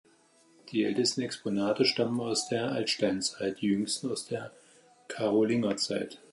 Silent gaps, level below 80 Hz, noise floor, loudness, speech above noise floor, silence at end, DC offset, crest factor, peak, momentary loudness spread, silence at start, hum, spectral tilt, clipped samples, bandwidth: none; -72 dBFS; -63 dBFS; -30 LUFS; 33 dB; 0.15 s; under 0.1%; 20 dB; -12 dBFS; 9 LU; 0.65 s; none; -4 dB/octave; under 0.1%; 11.5 kHz